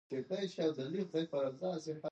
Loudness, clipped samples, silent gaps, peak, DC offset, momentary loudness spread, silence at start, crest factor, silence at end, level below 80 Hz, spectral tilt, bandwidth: -38 LUFS; under 0.1%; none; -22 dBFS; under 0.1%; 4 LU; 0.1 s; 16 dB; 0 s; -84 dBFS; -6.5 dB/octave; 8.6 kHz